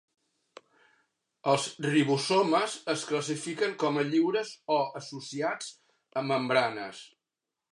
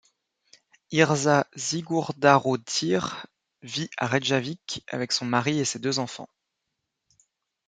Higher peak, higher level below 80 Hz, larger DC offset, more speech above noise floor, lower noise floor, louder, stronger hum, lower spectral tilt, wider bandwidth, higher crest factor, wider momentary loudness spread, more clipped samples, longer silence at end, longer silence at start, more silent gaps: second, -10 dBFS vs -2 dBFS; second, -82 dBFS vs -68 dBFS; neither; about the same, 60 dB vs 57 dB; first, -88 dBFS vs -82 dBFS; second, -29 LUFS vs -25 LUFS; neither; about the same, -4.5 dB/octave vs -4 dB/octave; first, 11.5 kHz vs 9.6 kHz; about the same, 20 dB vs 24 dB; about the same, 13 LU vs 13 LU; neither; second, 0.65 s vs 1.4 s; first, 1.45 s vs 0.9 s; neither